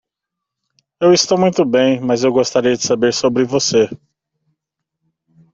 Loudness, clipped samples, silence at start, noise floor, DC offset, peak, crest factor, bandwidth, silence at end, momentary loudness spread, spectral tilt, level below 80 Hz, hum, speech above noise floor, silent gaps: -15 LUFS; under 0.1%; 1 s; -81 dBFS; under 0.1%; -2 dBFS; 16 dB; 7.8 kHz; 1.55 s; 4 LU; -4 dB/octave; -56 dBFS; none; 67 dB; none